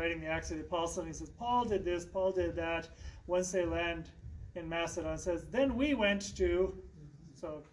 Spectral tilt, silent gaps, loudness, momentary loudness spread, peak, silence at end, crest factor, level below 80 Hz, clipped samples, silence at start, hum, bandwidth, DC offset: -4.5 dB/octave; none; -35 LUFS; 17 LU; -18 dBFS; 0.1 s; 18 dB; -50 dBFS; under 0.1%; 0 s; none; 11.5 kHz; under 0.1%